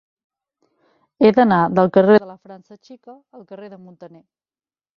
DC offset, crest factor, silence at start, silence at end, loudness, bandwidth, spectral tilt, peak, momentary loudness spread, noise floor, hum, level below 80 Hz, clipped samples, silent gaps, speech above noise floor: under 0.1%; 18 dB; 1.2 s; 0.9 s; -15 LUFS; 5.8 kHz; -9 dB/octave; 0 dBFS; 25 LU; under -90 dBFS; none; -60 dBFS; under 0.1%; none; over 72 dB